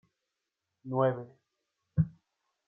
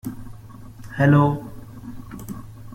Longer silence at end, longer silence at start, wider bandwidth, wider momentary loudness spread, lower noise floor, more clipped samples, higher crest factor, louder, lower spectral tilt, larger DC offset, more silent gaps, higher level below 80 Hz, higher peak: first, 0.6 s vs 0.05 s; first, 0.85 s vs 0.05 s; second, 3.5 kHz vs 15.5 kHz; second, 20 LU vs 26 LU; first, -86 dBFS vs -40 dBFS; neither; about the same, 20 dB vs 18 dB; second, -32 LUFS vs -19 LUFS; first, -11.5 dB/octave vs -8.5 dB/octave; neither; neither; second, -58 dBFS vs -46 dBFS; second, -14 dBFS vs -4 dBFS